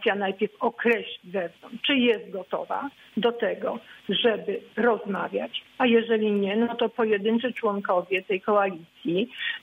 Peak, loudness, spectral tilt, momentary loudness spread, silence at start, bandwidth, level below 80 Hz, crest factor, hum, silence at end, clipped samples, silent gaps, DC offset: -8 dBFS; -26 LUFS; -7 dB/octave; 10 LU; 0 s; 4.8 kHz; -76 dBFS; 16 dB; none; 0.05 s; under 0.1%; none; under 0.1%